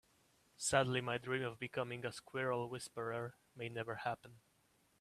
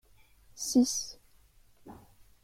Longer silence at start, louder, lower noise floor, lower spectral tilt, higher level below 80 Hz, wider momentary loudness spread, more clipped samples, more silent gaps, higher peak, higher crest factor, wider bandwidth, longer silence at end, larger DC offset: about the same, 0.6 s vs 0.55 s; second, -41 LUFS vs -30 LUFS; first, -75 dBFS vs -62 dBFS; about the same, -4 dB/octave vs -3 dB/octave; second, -74 dBFS vs -62 dBFS; second, 11 LU vs 27 LU; neither; neither; about the same, -16 dBFS vs -14 dBFS; about the same, 26 dB vs 22 dB; about the same, 15 kHz vs 16 kHz; first, 0.65 s vs 0.5 s; neither